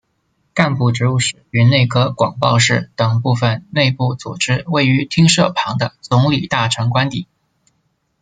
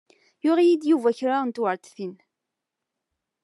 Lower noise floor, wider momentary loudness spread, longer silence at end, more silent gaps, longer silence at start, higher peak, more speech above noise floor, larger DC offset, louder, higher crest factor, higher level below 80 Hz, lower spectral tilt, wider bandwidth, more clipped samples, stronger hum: second, -65 dBFS vs -84 dBFS; second, 8 LU vs 17 LU; second, 1 s vs 1.3 s; neither; about the same, 0.55 s vs 0.45 s; first, 0 dBFS vs -10 dBFS; second, 50 dB vs 62 dB; neither; first, -15 LUFS vs -23 LUFS; about the same, 16 dB vs 16 dB; first, -50 dBFS vs under -90 dBFS; about the same, -5 dB/octave vs -6 dB/octave; second, 9.4 kHz vs 11.5 kHz; neither; neither